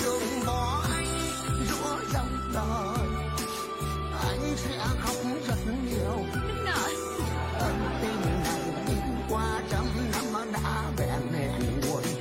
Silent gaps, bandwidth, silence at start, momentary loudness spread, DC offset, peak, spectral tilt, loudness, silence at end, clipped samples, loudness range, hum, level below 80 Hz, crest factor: none; 16 kHz; 0 s; 3 LU; under 0.1%; -16 dBFS; -5 dB/octave; -30 LUFS; 0 s; under 0.1%; 1 LU; none; -38 dBFS; 14 dB